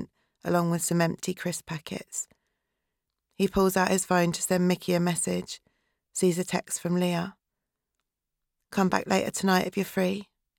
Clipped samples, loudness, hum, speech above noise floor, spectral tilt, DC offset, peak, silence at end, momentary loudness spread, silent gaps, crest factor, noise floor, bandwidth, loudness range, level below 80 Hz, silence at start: under 0.1%; -27 LUFS; none; 58 dB; -5 dB/octave; under 0.1%; -8 dBFS; 0.35 s; 12 LU; none; 20 dB; -85 dBFS; 17.5 kHz; 4 LU; -60 dBFS; 0 s